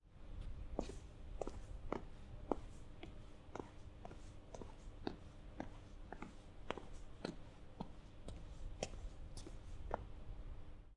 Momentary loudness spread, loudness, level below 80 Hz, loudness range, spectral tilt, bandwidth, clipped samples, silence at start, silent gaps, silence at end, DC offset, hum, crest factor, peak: 10 LU; -53 LUFS; -54 dBFS; 4 LU; -5.5 dB/octave; 11 kHz; under 0.1%; 0.05 s; none; 0 s; under 0.1%; none; 30 dB; -20 dBFS